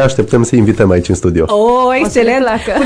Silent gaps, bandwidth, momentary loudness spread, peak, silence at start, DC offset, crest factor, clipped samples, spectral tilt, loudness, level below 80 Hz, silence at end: none; 11 kHz; 3 LU; 0 dBFS; 0 s; under 0.1%; 10 dB; under 0.1%; -6 dB/octave; -11 LUFS; -32 dBFS; 0 s